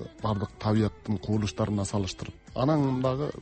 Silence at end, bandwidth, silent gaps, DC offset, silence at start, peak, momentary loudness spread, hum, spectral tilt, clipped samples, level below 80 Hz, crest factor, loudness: 0 s; 8.4 kHz; none; under 0.1%; 0 s; -12 dBFS; 8 LU; none; -6.5 dB/octave; under 0.1%; -50 dBFS; 16 dB; -29 LUFS